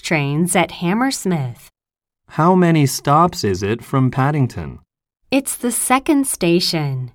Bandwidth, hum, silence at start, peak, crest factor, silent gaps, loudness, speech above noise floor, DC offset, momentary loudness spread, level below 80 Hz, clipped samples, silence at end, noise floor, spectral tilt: 18 kHz; none; 0.05 s; -2 dBFS; 16 dB; none; -17 LUFS; 71 dB; under 0.1%; 7 LU; -48 dBFS; under 0.1%; 0.05 s; -88 dBFS; -5 dB/octave